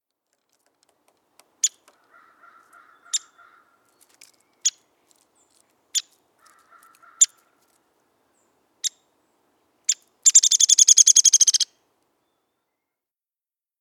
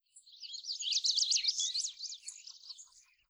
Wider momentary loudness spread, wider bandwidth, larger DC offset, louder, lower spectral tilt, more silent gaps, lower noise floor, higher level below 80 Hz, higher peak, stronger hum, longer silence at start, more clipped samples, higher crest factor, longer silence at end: second, 17 LU vs 21 LU; about the same, 19.5 kHz vs over 20 kHz; neither; first, -17 LUFS vs -32 LUFS; first, 7 dB/octave vs 9 dB/octave; neither; first, under -90 dBFS vs -60 dBFS; about the same, under -90 dBFS vs -88 dBFS; first, -2 dBFS vs -18 dBFS; neither; first, 1.65 s vs 0.15 s; neither; about the same, 24 dB vs 20 dB; first, 2.15 s vs 0.3 s